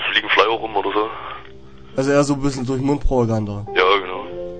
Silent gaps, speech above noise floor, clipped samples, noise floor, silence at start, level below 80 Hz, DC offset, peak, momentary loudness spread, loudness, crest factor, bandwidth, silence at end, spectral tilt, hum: none; 23 dB; under 0.1%; -42 dBFS; 0 s; -32 dBFS; 1%; 0 dBFS; 13 LU; -19 LUFS; 20 dB; 9.4 kHz; 0 s; -5 dB/octave; none